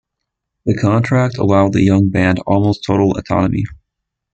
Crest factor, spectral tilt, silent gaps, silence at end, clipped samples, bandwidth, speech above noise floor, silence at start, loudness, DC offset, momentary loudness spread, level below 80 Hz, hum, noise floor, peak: 14 dB; -8 dB/octave; none; 0.6 s; under 0.1%; 8.4 kHz; 64 dB; 0.65 s; -15 LUFS; under 0.1%; 7 LU; -42 dBFS; none; -78 dBFS; -2 dBFS